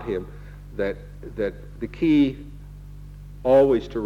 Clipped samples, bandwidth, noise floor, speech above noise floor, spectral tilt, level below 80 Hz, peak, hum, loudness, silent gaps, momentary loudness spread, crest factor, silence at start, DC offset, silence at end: under 0.1%; 7.4 kHz; -40 dBFS; 17 dB; -8 dB/octave; -42 dBFS; -8 dBFS; 50 Hz at -60 dBFS; -22 LUFS; none; 25 LU; 16 dB; 0 s; under 0.1%; 0 s